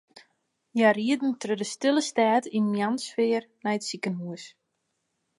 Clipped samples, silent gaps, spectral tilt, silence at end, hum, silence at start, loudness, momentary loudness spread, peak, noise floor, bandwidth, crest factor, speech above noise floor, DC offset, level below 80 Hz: under 0.1%; none; -4.5 dB/octave; 0.9 s; none; 0.75 s; -26 LUFS; 10 LU; -6 dBFS; -78 dBFS; 11.5 kHz; 20 dB; 52 dB; under 0.1%; -82 dBFS